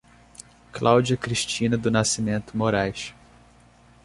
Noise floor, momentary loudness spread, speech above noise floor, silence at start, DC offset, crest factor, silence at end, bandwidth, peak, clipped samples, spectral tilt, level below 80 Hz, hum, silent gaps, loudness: -54 dBFS; 11 LU; 31 dB; 0.4 s; under 0.1%; 22 dB; 0.95 s; 11.5 kHz; -4 dBFS; under 0.1%; -4.5 dB/octave; -52 dBFS; none; none; -23 LUFS